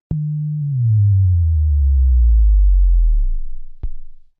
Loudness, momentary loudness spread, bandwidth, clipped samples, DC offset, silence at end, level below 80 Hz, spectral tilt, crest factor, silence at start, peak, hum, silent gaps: -17 LUFS; 18 LU; 0.5 kHz; under 0.1%; under 0.1%; 0.2 s; -16 dBFS; -15 dB/octave; 8 dB; 0.1 s; -8 dBFS; none; none